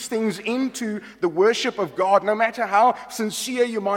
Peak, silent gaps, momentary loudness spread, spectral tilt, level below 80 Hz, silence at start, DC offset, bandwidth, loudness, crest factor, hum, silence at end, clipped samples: -4 dBFS; none; 8 LU; -3.5 dB/octave; -66 dBFS; 0 s; under 0.1%; 16.5 kHz; -22 LUFS; 18 dB; none; 0 s; under 0.1%